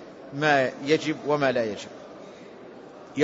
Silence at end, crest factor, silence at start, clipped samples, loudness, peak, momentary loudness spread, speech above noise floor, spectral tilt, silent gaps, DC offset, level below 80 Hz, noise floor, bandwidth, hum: 0 s; 20 dB; 0 s; under 0.1%; -24 LUFS; -6 dBFS; 22 LU; 20 dB; -5 dB/octave; none; under 0.1%; -70 dBFS; -44 dBFS; 8 kHz; none